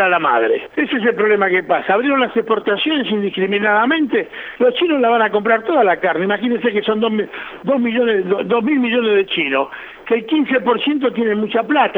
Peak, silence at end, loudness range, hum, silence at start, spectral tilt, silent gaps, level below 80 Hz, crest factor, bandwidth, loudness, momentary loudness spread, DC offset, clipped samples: -2 dBFS; 0 s; 1 LU; none; 0 s; -7.5 dB/octave; none; -60 dBFS; 14 dB; 4.2 kHz; -16 LUFS; 5 LU; under 0.1%; under 0.1%